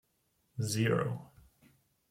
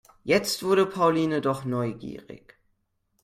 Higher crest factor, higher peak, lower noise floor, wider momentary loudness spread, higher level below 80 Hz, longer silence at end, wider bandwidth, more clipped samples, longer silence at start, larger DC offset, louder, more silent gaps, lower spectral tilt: about the same, 18 dB vs 18 dB; second, -18 dBFS vs -8 dBFS; about the same, -76 dBFS vs -73 dBFS; about the same, 14 LU vs 16 LU; second, -68 dBFS vs -62 dBFS; about the same, 0.85 s vs 0.9 s; about the same, 16 kHz vs 16 kHz; neither; first, 0.55 s vs 0.25 s; neither; second, -34 LUFS vs -25 LUFS; neither; about the same, -5.5 dB/octave vs -5 dB/octave